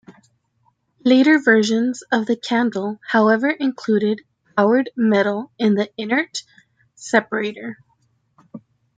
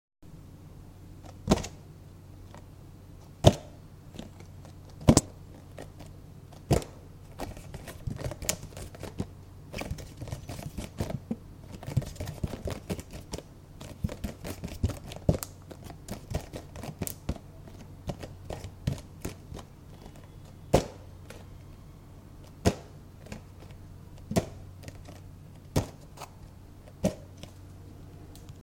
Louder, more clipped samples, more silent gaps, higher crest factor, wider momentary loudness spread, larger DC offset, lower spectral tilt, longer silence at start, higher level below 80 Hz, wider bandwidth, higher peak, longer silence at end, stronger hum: first, -19 LUFS vs -33 LUFS; neither; neither; second, 18 dB vs 34 dB; second, 12 LU vs 21 LU; neither; about the same, -5 dB/octave vs -5.5 dB/octave; first, 1.05 s vs 0.2 s; second, -70 dBFS vs -46 dBFS; second, 9.2 kHz vs 17 kHz; about the same, -2 dBFS vs -2 dBFS; first, 0.4 s vs 0 s; neither